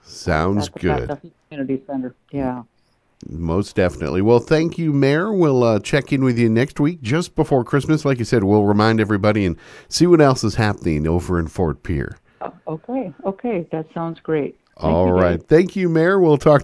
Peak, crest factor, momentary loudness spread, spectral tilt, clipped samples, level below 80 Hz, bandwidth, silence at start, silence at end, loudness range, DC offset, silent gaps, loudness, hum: 0 dBFS; 18 dB; 13 LU; -7 dB/octave; under 0.1%; -40 dBFS; 11 kHz; 0.1 s; 0 s; 8 LU; under 0.1%; none; -18 LUFS; none